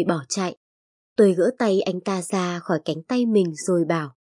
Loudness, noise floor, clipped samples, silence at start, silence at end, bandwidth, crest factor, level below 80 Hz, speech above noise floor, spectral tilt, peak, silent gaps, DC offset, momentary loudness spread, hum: -23 LUFS; under -90 dBFS; under 0.1%; 0 s; 0.2 s; 11.5 kHz; 16 dB; -74 dBFS; over 68 dB; -5.5 dB/octave; -6 dBFS; 0.57-1.16 s; under 0.1%; 8 LU; none